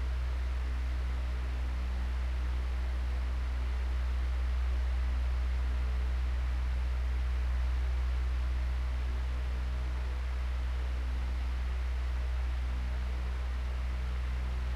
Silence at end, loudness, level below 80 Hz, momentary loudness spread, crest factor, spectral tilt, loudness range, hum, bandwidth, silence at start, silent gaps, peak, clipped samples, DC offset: 0 s; -35 LUFS; -32 dBFS; 3 LU; 8 dB; -6.5 dB/octave; 2 LU; none; 6.8 kHz; 0 s; none; -24 dBFS; under 0.1%; under 0.1%